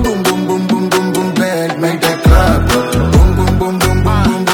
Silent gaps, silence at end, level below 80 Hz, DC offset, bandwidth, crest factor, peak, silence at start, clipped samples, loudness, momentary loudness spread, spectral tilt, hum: none; 0 s; -18 dBFS; under 0.1%; 19 kHz; 12 dB; 0 dBFS; 0 s; under 0.1%; -12 LUFS; 5 LU; -5.5 dB/octave; none